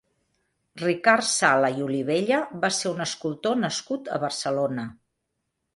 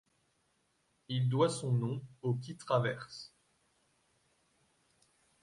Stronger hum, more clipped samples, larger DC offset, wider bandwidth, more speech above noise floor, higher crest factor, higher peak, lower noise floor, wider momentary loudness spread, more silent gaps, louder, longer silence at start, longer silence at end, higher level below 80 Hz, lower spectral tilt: neither; neither; neither; about the same, 11.5 kHz vs 11.5 kHz; first, 55 dB vs 43 dB; about the same, 22 dB vs 20 dB; first, -4 dBFS vs -16 dBFS; about the same, -79 dBFS vs -76 dBFS; second, 10 LU vs 16 LU; neither; first, -24 LUFS vs -34 LUFS; second, 0.75 s vs 1.1 s; second, 0.8 s vs 2.15 s; first, -70 dBFS vs -76 dBFS; second, -3.5 dB/octave vs -6 dB/octave